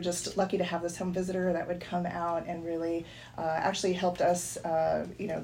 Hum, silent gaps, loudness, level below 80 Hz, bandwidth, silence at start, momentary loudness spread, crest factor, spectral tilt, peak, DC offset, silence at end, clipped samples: none; none; -31 LUFS; -60 dBFS; 16 kHz; 0 s; 6 LU; 16 dB; -4.5 dB/octave; -16 dBFS; under 0.1%; 0 s; under 0.1%